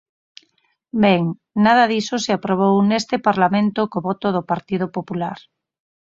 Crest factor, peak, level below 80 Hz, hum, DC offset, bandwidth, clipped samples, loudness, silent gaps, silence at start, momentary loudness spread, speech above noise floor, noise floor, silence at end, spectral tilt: 18 dB; -2 dBFS; -58 dBFS; none; under 0.1%; 7.6 kHz; under 0.1%; -19 LUFS; none; 0.95 s; 10 LU; 46 dB; -64 dBFS; 0.75 s; -6 dB/octave